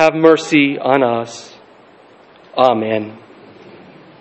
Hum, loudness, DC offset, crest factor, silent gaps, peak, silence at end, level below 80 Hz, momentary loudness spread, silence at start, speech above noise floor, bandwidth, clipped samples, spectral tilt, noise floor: none; -14 LUFS; under 0.1%; 16 dB; none; 0 dBFS; 1.05 s; -64 dBFS; 18 LU; 0 s; 31 dB; 8.4 kHz; under 0.1%; -5.5 dB/octave; -45 dBFS